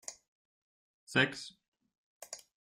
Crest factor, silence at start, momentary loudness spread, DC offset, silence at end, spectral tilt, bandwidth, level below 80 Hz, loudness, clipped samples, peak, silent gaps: 26 dB; 0.1 s; 19 LU; under 0.1%; 0.35 s; -3.5 dB/octave; 16 kHz; -74 dBFS; -32 LUFS; under 0.1%; -14 dBFS; 0.28-1.07 s, 1.68-1.72 s, 1.98-2.21 s